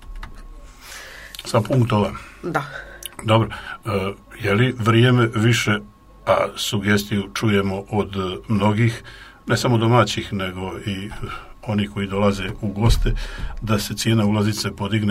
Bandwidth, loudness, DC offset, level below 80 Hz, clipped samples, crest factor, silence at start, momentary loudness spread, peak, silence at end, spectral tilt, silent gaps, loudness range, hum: 16 kHz; -21 LUFS; under 0.1%; -34 dBFS; under 0.1%; 20 dB; 0 s; 16 LU; -2 dBFS; 0 s; -5.5 dB/octave; none; 4 LU; none